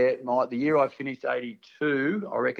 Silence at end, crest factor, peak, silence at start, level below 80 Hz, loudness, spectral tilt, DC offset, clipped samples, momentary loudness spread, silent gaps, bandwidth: 0 s; 16 dB; -12 dBFS; 0 s; -76 dBFS; -27 LUFS; -7.5 dB/octave; under 0.1%; under 0.1%; 8 LU; none; 6.6 kHz